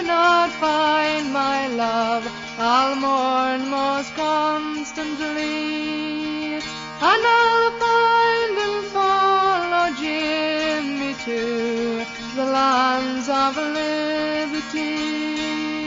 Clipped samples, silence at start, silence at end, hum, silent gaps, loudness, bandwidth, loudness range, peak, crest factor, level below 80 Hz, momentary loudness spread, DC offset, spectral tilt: under 0.1%; 0 s; 0 s; none; none; -20 LUFS; 7.6 kHz; 4 LU; -4 dBFS; 16 dB; -56 dBFS; 9 LU; under 0.1%; -3 dB/octave